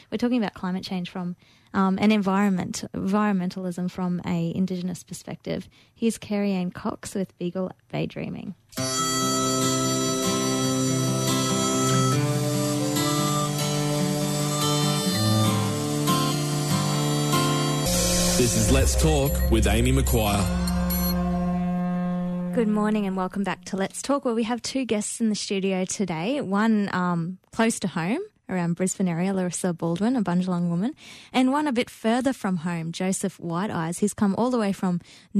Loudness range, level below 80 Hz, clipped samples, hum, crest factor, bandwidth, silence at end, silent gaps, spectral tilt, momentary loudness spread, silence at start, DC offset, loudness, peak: 6 LU; -36 dBFS; under 0.1%; none; 14 dB; 13.5 kHz; 0 s; none; -4.5 dB/octave; 9 LU; 0.1 s; under 0.1%; -24 LUFS; -10 dBFS